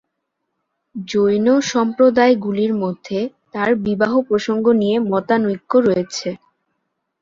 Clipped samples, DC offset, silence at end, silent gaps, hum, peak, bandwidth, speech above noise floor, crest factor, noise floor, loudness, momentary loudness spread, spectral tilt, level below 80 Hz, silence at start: under 0.1%; under 0.1%; 0.85 s; none; none; -2 dBFS; 7.8 kHz; 59 dB; 16 dB; -75 dBFS; -17 LUFS; 10 LU; -5.5 dB/octave; -58 dBFS; 0.95 s